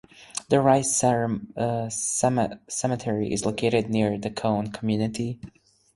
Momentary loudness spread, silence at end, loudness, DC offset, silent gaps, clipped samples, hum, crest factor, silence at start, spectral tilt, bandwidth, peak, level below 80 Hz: 9 LU; 0.45 s; -25 LUFS; under 0.1%; none; under 0.1%; none; 20 dB; 0.2 s; -5 dB/octave; 12 kHz; -6 dBFS; -56 dBFS